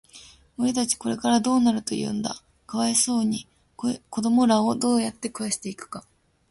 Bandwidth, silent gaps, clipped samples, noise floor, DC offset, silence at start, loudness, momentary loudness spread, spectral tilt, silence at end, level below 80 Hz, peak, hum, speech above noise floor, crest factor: 11.5 kHz; none; under 0.1%; -50 dBFS; under 0.1%; 0.15 s; -24 LUFS; 14 LU; -3.5 dB/octave; 0.5 s; -60 dBFS; -8 dBFS; none; 26 dB; 18 dB